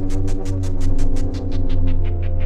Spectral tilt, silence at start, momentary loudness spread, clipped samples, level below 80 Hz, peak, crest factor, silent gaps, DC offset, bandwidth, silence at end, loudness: -7.5 dB/octave; 0 s; 2 LU; under 0.1%; -18 dBFS; -6 dBFS; 10 dB; none; 2%; 7.6 kHz; 0 s; -24 LUFS